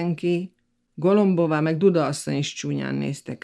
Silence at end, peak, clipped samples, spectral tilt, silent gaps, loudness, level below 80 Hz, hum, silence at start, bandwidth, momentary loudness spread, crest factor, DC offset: 0.1 s; -6 dBFS; under 0.1%; -6.5 dB/octave; none; -23 LUFS; -68 dBFS; none; 0 s; 12.5 kHz; 9 LU; 16 dB; under 0.1%